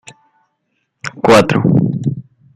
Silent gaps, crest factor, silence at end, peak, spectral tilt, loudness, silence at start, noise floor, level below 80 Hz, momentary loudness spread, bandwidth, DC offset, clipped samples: none; 16 dB; 0.35 s; 0 dBFS; -6.5 dB/octave; -13 LUFS; 1.05 s; -68 dBFS; -48 dBFS; 19 LU; 15.5 kHz; under 0.1%; under 0.1%